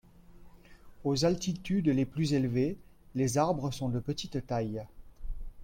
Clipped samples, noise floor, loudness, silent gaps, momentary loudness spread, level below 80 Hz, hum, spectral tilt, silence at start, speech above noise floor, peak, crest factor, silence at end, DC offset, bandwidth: under 0.1%; -53 dBFS; -31 LUFS; none; 19 LU; -48 dBFS; none; -6 dB/octave; 0.3 s; 23 dB; -14 dBFS; 18 dB; 0 s; under 0.1%; 16.5 kHz